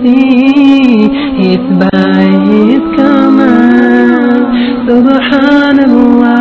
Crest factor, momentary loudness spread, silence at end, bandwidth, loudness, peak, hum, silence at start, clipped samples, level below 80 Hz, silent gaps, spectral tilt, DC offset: 6 dB; 4 LU; 0 s; 6 kHz; -7 LUFS; 0 dBFS; none; 0 s; 5%; -38 dBFS; none; -8 dB/octave; under 0.1%